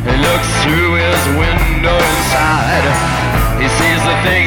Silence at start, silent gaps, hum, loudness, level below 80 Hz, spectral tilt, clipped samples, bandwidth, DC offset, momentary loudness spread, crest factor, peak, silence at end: 0 s; none; none; -12 LUFS; -20 dBFS; -4.5 dB/octave; under 0.1%; 19 kHz; under 0.1%; 2 LU; 10 dB; -2 dBFS; 0 s